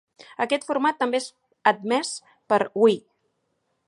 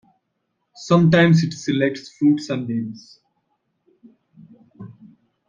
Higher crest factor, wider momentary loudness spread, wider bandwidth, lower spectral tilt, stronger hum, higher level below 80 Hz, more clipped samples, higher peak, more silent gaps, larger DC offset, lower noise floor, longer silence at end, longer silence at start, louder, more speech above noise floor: about the same, 22 dB vs 20 dB; second, 12 LU vs 25 LU; first, 11.5 kHz vs 7.4 kHz; second, -3.5 dB/octave vs -7 dB/octave; neither; second, -76 dBFS vs -58 dBFS; neither; about the same, -4 dBFS vs -2 dBFS; neither; neither; about the same, -74 dBFS vs -74 dBFS; first, 0.9 s vs 0.6 s; second, 0.4 s vs 0.8 s; second, -24 LUFS vs -18 LUFS; second, 51 dB vs 56 dB